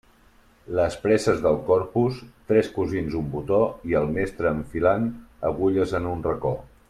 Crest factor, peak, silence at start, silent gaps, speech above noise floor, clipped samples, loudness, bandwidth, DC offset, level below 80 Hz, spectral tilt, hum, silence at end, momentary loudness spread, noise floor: 18 dB; -6 dBFS; 0.7 s; none; 33 dB; under 0.1%; -24 LUFS; 13.5 kHz; under 0.1%; -46 dBFS; -7 dB/octave; none; 0.25 s; 8 LU; -56 dBFS